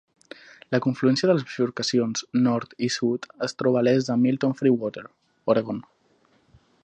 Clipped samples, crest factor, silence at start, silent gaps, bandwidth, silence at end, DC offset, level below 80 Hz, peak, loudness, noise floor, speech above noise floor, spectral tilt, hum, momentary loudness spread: under 0.1%; 18 dB; 0.7 s; none; 9 kHz; 1 s; under 0.1%; -70 dBFS; -6 dBFS; -24 LUFS; -63 dBFS; 40 dB; -5.5 dB/octave; none; 11 LU